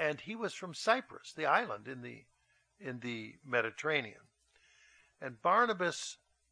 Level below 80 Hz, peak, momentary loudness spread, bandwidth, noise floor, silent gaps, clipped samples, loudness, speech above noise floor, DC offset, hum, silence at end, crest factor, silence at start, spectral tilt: -82 dBFS; -14 dBFS; 18 LU; 10.5 kHz; -69 dBFS; none; under 0.1%; -34 LUFS; 34 dB; under 0.1%; none; 0.35 s; 24 dB; 0 s; -3.5 dB/octave